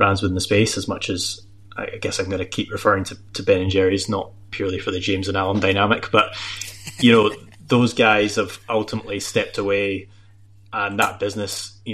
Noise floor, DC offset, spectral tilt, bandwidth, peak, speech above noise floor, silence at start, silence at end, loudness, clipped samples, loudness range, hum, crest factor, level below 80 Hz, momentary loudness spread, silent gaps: -49 dBFS; 0.4%; -4.5 dB/octave; 15 kHz; -2 dBFS; 29 dB; 0 s; 0 s; -21 LUFS; under 0.1%; 4 LU; none; 18 dB; -50 dBFS; 13 LU; none